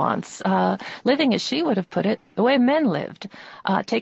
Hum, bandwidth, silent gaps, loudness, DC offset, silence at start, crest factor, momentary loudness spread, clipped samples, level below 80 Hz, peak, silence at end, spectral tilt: none; 8.2 kHz; none; -22 LUFS; under 0.1%; 0 s; 16 dB; 11 LU; under 0.1%; -66 dBFS; -6 dBFS; 0 s; -5.5 dB/octave